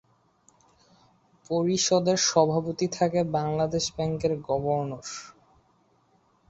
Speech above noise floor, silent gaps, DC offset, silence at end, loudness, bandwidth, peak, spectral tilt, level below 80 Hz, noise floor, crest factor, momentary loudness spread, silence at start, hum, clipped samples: 40 dB; none; under 0.1%; 1.2 s; -26 LUFS; 8.2 kHz; -8 dBFS; -4.5 dB/octave; -58 dBFS; -65 dBFS; 20 dB; 9 LU; 1.5 s; none; under 0.1%